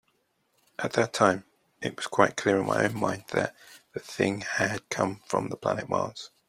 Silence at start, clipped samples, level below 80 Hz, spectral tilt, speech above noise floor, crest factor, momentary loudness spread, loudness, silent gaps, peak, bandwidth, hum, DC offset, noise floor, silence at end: 0.8 s; under 0.1%; -66 dBFS; -4.5 dB/octave; 45 dB; 24 dB; 12 LU; -28 LUFS; none; -4 dBFS; 16 kHz; none; under 0.1%; -72 dBFS; 0.2 s